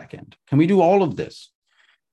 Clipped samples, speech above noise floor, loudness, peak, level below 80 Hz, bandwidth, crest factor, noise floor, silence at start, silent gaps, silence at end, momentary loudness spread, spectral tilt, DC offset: under 0.1%; 43 dB; -18 LUFS; -4 dBFS; -58 dBFS; 9.8 kHz; 16 dB; -62 dBFS; 0 s; none; 0.85 s; 17 LU; -8.5 dB/octave; under 0.1%